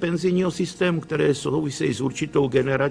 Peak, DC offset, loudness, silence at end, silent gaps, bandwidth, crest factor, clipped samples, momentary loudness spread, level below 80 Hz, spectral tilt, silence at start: -8 dBFS; under 0.1%; -23 LUFS; 0 s; none; 10.5 kHz; 14 dB; under 0.1%; 4 LU; -54 dBFS; -6 dB/octave; 0 s